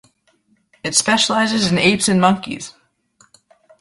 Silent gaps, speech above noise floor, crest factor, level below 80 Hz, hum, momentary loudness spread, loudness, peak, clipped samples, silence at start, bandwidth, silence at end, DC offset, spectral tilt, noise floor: none; 44 dB; 18 dB; -54 dBFS; none; 15 LU; -15 LUFS; -2 dBFS; under 0.1%; 0.85 s; 11.5 kHz; 1.1 s; under 0.1%; -3.5 dB/octave; -61 dBFS